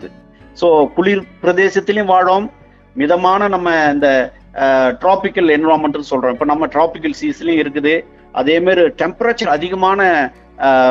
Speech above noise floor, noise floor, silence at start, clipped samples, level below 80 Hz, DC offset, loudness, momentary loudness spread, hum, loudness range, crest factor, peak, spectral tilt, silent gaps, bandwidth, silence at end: 28 dB; -41 dBFS; 0 s; under 0.1%; -46 dBFS; under 0.1%; -14 LUFS; 7 LU; none; 2 LU; 14 dB; 0 dBFS; -5.5 dB/octave; none; 7.6 kHz; 0 s